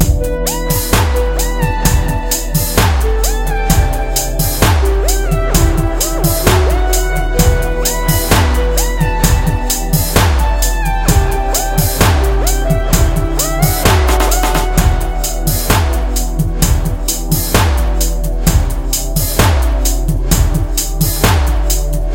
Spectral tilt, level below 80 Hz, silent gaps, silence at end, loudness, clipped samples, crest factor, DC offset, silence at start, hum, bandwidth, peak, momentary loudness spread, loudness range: -4.5 dB/octave; -14 dBFS; none; 0 s; -14 LUFS; under 0.1%; 12 dB; under 0.1%; 0 s; none; 17.5 kHz; 0 dBFS; 4 LU; 2 LU